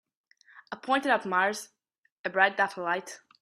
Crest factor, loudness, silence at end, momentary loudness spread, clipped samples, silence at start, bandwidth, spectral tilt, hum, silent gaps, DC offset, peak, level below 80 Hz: 24 dB; -27 LUFS; 0.25 s; 18 LU; under 0.1%; 0.55 s; 14.5 kHz; -3 dB/octave; none; 1.98-2.02 s, 2.12-2.24 s; under 0.1%; -8 dBFS; -80 dBFS